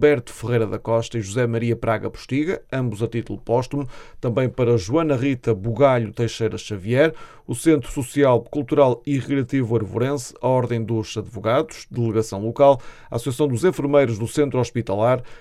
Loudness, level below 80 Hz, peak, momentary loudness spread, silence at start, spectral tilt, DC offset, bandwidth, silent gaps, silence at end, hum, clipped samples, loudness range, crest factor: -21 LUFS; -46 dBFS; -2 dBFS; 8 LU; 0 s; -6.5 dB/octave; under 0.1%; 14 kHz; none; 0 s; none; under 0.1%; 3 LU; 18 dB